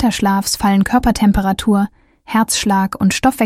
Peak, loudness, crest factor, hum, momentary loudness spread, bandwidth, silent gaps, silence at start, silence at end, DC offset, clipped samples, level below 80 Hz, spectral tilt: -2 dBFS; -15 LUFS; 12 dB; none; 4 LU; 16 kHz; none; 0 s; 0 s; under 0.1%; under 0.1%; -32 dBFS; -4.5 dB/octave